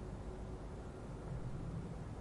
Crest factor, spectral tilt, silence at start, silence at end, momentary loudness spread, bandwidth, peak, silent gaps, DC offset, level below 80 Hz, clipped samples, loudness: 12 dB; -7.5 dB/octave; 0 s; 0 s; 4 LU; 11.5 kHz; -32 dBFS; none; under 0.1%; -50 dBFS; under 0.1%; -48 LUFS